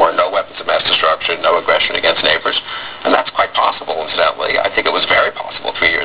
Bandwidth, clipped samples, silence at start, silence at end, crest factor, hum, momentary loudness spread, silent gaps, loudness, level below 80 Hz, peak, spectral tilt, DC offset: 4 kHz; under 0.1%; 0 s; 0 s; 16 dB; none; 7 LU; none; -14 LUFS; -48 dBFS; 0 dBFS; -5.5 dB/octave; 0.8%